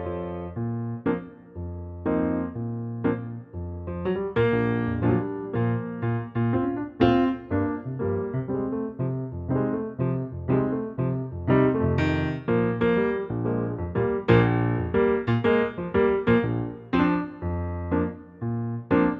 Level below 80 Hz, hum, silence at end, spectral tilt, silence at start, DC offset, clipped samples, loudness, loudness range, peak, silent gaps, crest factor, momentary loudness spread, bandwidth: -46 dBFS; none; 0 s; -10 dB/octave; 0 s; under 0.1%; under 0.1%; -26 LUFS; 5 LU; -6 dBFS; none; 20 dB; 10 LU; 5.4 kHz